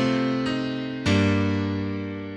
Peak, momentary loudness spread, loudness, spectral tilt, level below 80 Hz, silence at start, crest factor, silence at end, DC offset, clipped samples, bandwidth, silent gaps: -10 dBFS; 8 LU; -25 LUFS; -6.5 dB/octave; -50 dBFS; 0 s; 14 dB; 0 s; under 0.1%; under 0.1%; 10.5 kHz; none